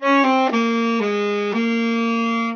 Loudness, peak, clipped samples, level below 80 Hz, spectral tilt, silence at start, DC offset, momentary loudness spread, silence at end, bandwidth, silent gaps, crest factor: -19 LUFS; -4 dBFS; under 0.1%; -84 dBFS; -5 dB/octave; 0 s; under 0.1%; 5 LU; 0 s; 6.8 kHz; none; 14 dB